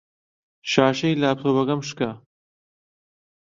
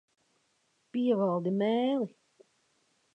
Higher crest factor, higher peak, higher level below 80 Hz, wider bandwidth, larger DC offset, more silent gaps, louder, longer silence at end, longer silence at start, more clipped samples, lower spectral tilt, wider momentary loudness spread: first, 22 dB vs 16 dB; first, -2 dBFS vs -16 dBFS; first, -64 dBFS vs -86 dBFS; about the same, 7.6 kHz vs 8 kHz; neither; neither; first, -22 LUFS vs -30 LUFS; first, 1.25 s vs 1.05 s; second, 0.65 s vs 0.95 s; neither; second, -5.5 dB/octave vs -8.5 dB/octave; about the same, 9 LU vs 9 LU